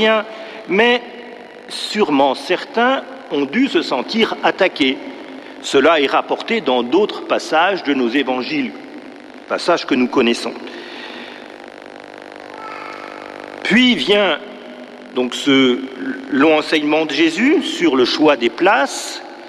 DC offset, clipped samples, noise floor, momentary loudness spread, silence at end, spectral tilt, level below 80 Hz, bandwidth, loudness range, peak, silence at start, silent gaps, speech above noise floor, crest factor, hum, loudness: under 0.1%; under 0.1%; -36 dBFS; 20 LU; 0 s; -4 dB/octave; -60 dBFS; 13 kHz; 6 LU; -2 dBFS; 0 s; none; 20 dB; 14 dB; none; -16 LUFS